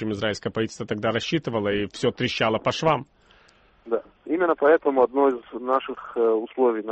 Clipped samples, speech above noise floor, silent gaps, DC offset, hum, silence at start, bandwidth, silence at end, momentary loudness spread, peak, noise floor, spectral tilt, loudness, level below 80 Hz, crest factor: under 0.1%; 34 dB; none; under 0.1%; none; 0 s; 8.4 kHz; 0 s; 10 LU; -8 dBFS; -57 dBFS; -5.5 dB/octave; -24 LUFS; -58 dBFS; 16 dB